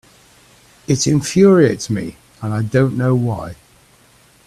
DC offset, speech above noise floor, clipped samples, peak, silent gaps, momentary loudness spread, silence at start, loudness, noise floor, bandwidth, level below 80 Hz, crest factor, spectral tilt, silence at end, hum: under 0.1%; 36 dB; under 0.1%; 0 dBFS; none; 18 LU; 0.9 s; -16 LUFS; -51 dBFS; 13.5 kHz; -50 dBFS; 16 dB; -6 dB/octave; 0.9 s; none